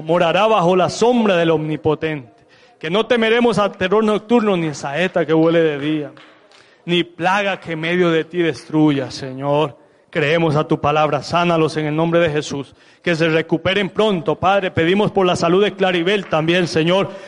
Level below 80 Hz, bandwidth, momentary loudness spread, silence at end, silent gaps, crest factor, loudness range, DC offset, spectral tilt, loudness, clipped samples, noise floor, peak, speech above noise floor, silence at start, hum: -54 dBFS; 11 kHz; 8 LU; 0 s; none; 14 dB; 2 LU; under 0.1%; -6 dB/octave; -17 LUFS; under 0.1%; -49 dBFS; -2 dBFS; 32 dB; 0 s; none